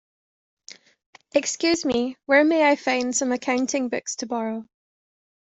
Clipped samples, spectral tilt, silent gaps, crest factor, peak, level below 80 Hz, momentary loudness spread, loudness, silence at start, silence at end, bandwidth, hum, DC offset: under 0.1%; -2 dB/octave; none; 20 dB; -6 dBFS; -64 dBFS; 10 LU; -22 LUFS; 1.35 s; 0.8 s; 8.2 kHz; none; under 0.1%